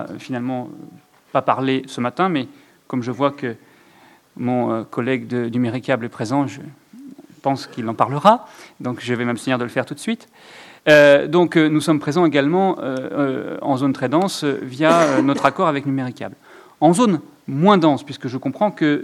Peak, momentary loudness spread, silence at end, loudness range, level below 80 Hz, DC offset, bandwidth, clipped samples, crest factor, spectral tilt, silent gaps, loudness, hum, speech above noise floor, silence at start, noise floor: 0 dBFS; 13 LU; 0 s; 7 LU; -68 dBFS; under 0.1%; 13.5 kHz; under 0.1%; 20 dB; -6 dB/octave; none; -19 LUFS; none; 32 dB; 0 s; -51 dBFS